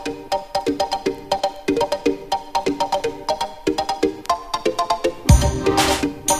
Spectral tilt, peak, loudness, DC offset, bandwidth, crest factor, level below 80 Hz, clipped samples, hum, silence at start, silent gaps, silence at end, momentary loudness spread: -4.5 dB/octave; 0 dBFS; -21 LUFS; under 0.1%; 15.5 kHz; 20 dB; -28 dBFS; under 0.1%; none; 0 s; none; 0 s; 8 LU